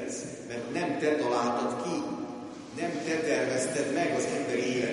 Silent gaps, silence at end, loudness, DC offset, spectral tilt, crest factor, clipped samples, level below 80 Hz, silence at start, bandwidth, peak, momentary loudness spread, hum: none; 0 s; -30 LUFS; under 0.1%; -4 dB/octave; 16 dB; under 0.1%; -70 dBFS; 0 s; 11.5 kHz; -14 dBFS; 10 LU; none